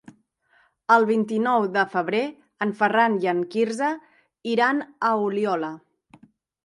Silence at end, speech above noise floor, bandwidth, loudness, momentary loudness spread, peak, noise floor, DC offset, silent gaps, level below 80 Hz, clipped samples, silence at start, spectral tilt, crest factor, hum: 0.85 s; 41 dB; 11.5 kHz; -23 LUFS; 13 LU; -4 dBFS; -63 dBFS; under 0.1%; none; -76 dBFS; under 0.1%; 0.9 s; -5.5 dB/octave; 20 dB; none